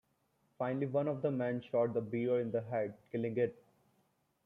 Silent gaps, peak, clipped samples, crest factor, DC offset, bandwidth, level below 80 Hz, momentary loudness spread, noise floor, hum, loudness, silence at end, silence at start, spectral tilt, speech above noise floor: none; -22 dBFS; under 0.1%; 16 dB; under 0.1%; 4 kHz; -78 dBFS; 5 LU; -77 dBFS; none; -36 LUFS; 0.95 s; 0.6 s; -10 dB/octave; 42 dB